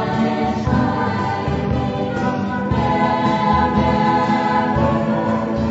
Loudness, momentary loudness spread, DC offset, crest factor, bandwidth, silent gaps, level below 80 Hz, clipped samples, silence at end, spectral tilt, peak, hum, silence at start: -18 LUFS; 5 LU; under 0.1%; 14 dB; 8 kHz; none; -34 dBFS; under 0.1%; 0 s; -7.5 dB/octave; -4 dBFS; none; 0 s